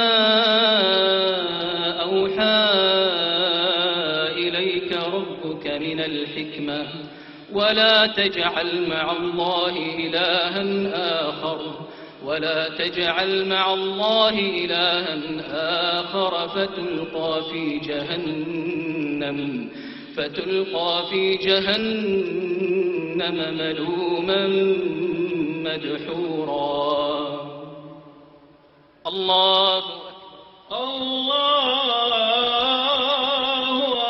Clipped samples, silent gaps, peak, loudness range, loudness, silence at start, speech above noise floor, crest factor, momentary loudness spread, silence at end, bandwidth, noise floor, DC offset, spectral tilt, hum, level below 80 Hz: under 0.1%; none; -4 dBFS; 6 LU; -21 LUFS; 0 s; 31 dB; 18 dB; 12 LU; 0 s; 6.2 kHz; -53 dBFS; under 0.1%; -6 dB/octave; none; -60 dBFS